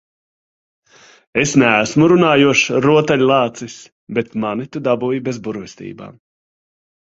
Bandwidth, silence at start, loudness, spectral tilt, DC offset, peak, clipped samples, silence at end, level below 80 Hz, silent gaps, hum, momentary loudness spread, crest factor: 8 kHz; 1.35 s; -15 LUFS; -5 dB/octave; under 0.1%; 0 dBFS; under 0.1%; 0.9 s; -54 dBFS; 3.92-4.07 s; none; 20 LU; 16 dB